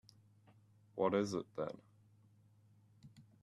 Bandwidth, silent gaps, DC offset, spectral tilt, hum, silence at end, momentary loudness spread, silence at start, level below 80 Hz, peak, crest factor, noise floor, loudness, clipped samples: 12 kHz; none; under 0.1%; -6 dB/octave; none; 0.2 s; 27 LU; 0.95 s; -80 dBFS; -22 dBFS; 22 dB; -68 dBFS; -39 LUFS; under 0.1%